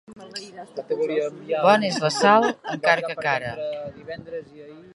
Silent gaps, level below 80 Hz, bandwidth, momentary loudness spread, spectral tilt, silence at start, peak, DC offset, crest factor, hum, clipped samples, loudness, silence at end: none; -64 dBFS; 11.5 kHz; 19 LU; -4 dB/octave; 0.1 s; -2 dBFS; under 0.1%; 20 dB; none; under 0.1%; -22 LUFS; 0.15 s